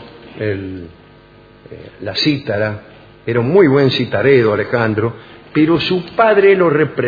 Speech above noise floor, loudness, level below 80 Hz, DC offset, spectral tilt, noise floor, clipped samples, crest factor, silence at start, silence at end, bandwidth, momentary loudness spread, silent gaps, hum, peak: 29 dB; -14 LUFS; -50 dBFS; under 0.1%; -7.5 dB/octave; -43 dBFS; under 0.1%; 16 dB; 0 s; 0 s; 5 kHz; 16 LU; none; none; 0 dBFS